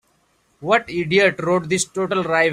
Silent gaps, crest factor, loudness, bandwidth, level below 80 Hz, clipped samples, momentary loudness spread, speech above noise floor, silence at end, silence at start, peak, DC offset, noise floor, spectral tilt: none; 18 dB; -19 LUFS; 15 kHz; -58 dBFS; under 0.1%; 5 LU; 44 dB; 0 s; 0.6 s; -2 dBFS; under 0.1%; -63 dBFS; -4 dB/octave